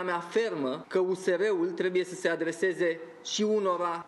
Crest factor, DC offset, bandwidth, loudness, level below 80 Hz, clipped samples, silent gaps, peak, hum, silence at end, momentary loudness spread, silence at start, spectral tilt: 16 dB; under 0.1%; 12 kHz; -29 LUFS; -86 dBFS; under 0.1%; none; -14 dBFS; none; 0 s; 4 LU; 0 s; -4 dB/octave